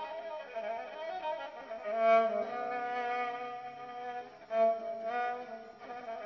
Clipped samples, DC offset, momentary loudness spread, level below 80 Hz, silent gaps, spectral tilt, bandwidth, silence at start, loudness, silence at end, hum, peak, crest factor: under 0.1%; under 0.1%; 16 LU; -80 dBFS; none; -1 dB/octave; 6.4 kHz; 0 s; -35 LUFS; 0 s; none; -16 dBFS; 20 dB